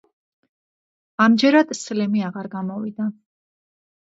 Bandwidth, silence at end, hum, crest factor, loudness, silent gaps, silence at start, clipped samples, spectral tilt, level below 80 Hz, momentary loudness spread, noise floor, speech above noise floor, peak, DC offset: 8 kHz; 1.05 s; none; 20 dB; -20 LUFS; none; 1.2 s; under 0.1%; -5 dB/octave; -74 dBFS; 13 LU; under -90 dBFS; over 71 dB; -2 dBFS; under 0.1%